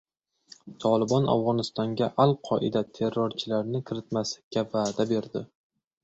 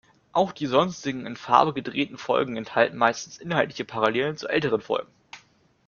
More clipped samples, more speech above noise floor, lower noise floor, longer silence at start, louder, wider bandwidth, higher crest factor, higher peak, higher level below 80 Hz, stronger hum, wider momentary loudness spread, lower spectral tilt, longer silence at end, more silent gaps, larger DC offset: neither; second, 29 dB vs 35 dB; about the same, -56 dBFS vs -59 dBFS; first, 0.65 s vs 0.35 s; about the same, -27 LUFS vs -25 LUFS; first, 8 kHz vs 7.2 kHz; about the same, 20 dB vs 22 dB; second, -6 dBFS vs -2 dBFS; about the same, -64 dBFS vs -64 dBFS; neither; about the same, 8 LU vs 9 LU; first, -6.5 dB/octave vs -5 dB/octave; about the same, 0.6 s vs 0.5 s; first, 4.43-4.51 s vs none; neither